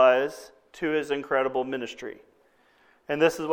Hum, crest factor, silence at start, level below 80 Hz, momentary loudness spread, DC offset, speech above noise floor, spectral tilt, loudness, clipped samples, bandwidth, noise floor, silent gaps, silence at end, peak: none; 20 dB; 0 s; -66 dBFS; 19 LU; under 0.1%; 35 dB; -4.5 dB/octave; -27 LUFS; under 0.1%; 17.5 kHz; -63 dBFS; none; 0 s; -8 dBFS